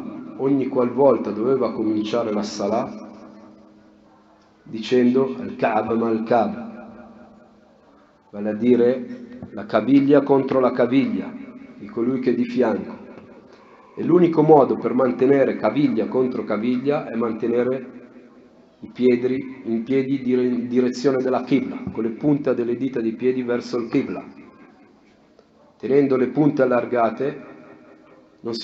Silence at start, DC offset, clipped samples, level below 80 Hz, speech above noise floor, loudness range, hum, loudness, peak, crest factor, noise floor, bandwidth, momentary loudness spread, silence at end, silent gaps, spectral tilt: 0 s; under 0.1%; under 0.1%; -66 dBFS; 34 dB; 6 LU; none; -20 LUFS; 0 dBFS; 20 dB; -54 dBFS; 7.6 kHz; 17 LU; 0 s; none; -6.5 dB/octave